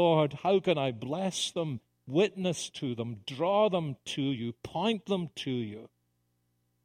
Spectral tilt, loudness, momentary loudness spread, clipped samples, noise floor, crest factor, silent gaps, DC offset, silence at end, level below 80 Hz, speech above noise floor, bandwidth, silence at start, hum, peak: -5.5 dB/octave; -31 LUFS; 10 LU; under 0.1%; -76 dBFS; 20 dB; none; under 0.1%; 1 s; -70 dBFS; 46 dB; 15.5 kHz; 0 s; 60 Hz at -55 dBFS; -12 dBFS